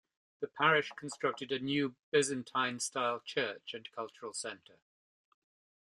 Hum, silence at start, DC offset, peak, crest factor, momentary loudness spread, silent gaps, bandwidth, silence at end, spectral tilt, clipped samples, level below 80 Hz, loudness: none; 0.4 s; under 0.1%; -12 dBFS; 26 dB; 15 LU; 1.99-2.12 s; 12.5 kHz; 1.35 s; -3 dB/octave; under 0.1%; -80 dBFS; -35 LUFS